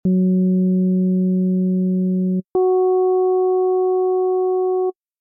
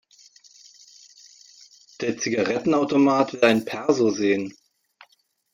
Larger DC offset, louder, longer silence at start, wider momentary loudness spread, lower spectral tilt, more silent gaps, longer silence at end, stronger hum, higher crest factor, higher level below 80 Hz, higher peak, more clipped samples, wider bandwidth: neither; first, -18 LUFS vs -22 LUFS; second, 0.05 s vs 2 s; second, 3 LU vs 8 LU; first, -15.5 dB/octave vs -4.5 dB/octave; neither; second, 0.3 s vs 1.05 s; neither; second, 6 dB vs 20 dB; about the same, -62 dBFS vs -66 dBFS; second, -12 dBFS vs -4 dBFS; neither; second, 1.2 kHz vs 16 kHz